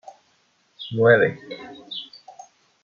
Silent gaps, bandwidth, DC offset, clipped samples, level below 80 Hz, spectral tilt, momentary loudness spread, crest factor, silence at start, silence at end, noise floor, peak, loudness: none; 7 kHz; under 0.1%; under 0.1%; -70 dBFS; -6.5 dB/octave; 23 LU; 22 dB; 0.8 s; 0.8 s; -64 dBFS; -4 dBFS; -20 LUFS